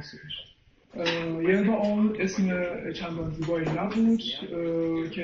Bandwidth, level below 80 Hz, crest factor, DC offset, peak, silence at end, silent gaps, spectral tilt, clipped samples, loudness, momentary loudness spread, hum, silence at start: 7.4 kHz; -54 dBFS; 16 dB; under 0.1%; -12 dBFS; 0 s; none; -6 dB/octave; under 0.1%; -27 LUFS; 11 LU; none; 0 s